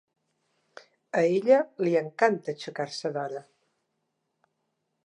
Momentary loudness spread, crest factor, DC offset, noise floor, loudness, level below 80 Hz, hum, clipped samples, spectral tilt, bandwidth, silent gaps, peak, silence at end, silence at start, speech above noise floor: 12 LU; 22 dB; under 0.1%; -79 dBFS; -27 LUFS; -86 dBFS; none; under 0.1%; -5.5 dB/octave; 10.5 kHz; none; -8 dBFS; 1.65 s; 1.15 s; 53 dB